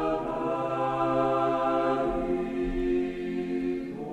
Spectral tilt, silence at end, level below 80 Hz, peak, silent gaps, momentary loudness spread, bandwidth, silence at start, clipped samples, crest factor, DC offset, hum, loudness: -7.5 dB/octave; 0 s; -44 dBFS; -12 dBFS; none; 6 LU; 9 kHz; 0 s; under 0.1%; 16 dB; under 0.1%; none; -28 LUFS